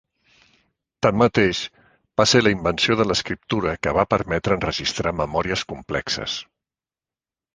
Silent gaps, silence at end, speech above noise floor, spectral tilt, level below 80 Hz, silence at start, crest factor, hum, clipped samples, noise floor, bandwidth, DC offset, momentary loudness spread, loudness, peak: none; 1.1 s; over 69 dB; -4.5 dB/octave; -44 dBFS; 1 s; 22 dB; none; under 0.1%; under -90 dBFS; 10 kHz; under 0.1%; 10 LU; -21 LUFS; -2 dBFS